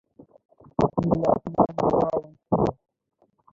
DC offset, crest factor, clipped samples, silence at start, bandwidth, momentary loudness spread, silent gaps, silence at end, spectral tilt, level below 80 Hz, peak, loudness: under 0.1%; 20 dB; under 0.1%; 0.8 s; 7.6 kHz; 5 LU; none; 0.8 s; -9.5 dB/octave; -48 dBFS; -6 dBFS; -24 LUFS